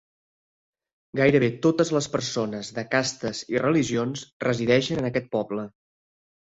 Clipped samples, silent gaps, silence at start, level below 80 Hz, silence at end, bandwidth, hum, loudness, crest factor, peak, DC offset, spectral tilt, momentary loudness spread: under 0.1%; 4.32-4.40 s; 1.15 s; -58 dBFS; 0.8 s; 8 kHz; none; -25 LUFS; 20 dB; -6 dBFS; under 0.1%; -5 dB/octave; 11 LU